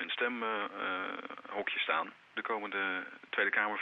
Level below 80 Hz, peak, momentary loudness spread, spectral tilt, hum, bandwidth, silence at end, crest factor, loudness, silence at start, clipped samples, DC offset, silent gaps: -84 dBFS; -16 dBFS; 10 LU; -5 dB/octave; none; 7 kHz; 0 s; 20 dB; -35 LUFS; 0 s; under 0.1%; under 0.1%; none